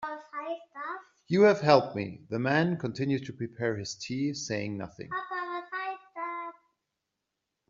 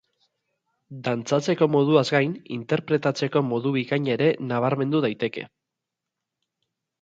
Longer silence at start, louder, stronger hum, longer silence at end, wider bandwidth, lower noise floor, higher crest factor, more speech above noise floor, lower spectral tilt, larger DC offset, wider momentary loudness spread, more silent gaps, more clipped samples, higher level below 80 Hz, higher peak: second, 0 s vs 0.9 s; second, -30 LUFS vs -23 LUFS; neither; second, 1.15 s vs 1.55 s; about the same, 7.6 kHz vs 8 kHz; about the same, -85 dBFS vs -85 dBFS; first, 24 dB vs 18 dB; second, 57 dB vs 62 dB; second, -5 dB/octave vs -6.5 dB/octave; neither; first, 16 LU vs 11 LU; neither; neither; about the same, -70 dBFS vs -70 dBFS; about the same, -6 dBFS vs -6 dBFS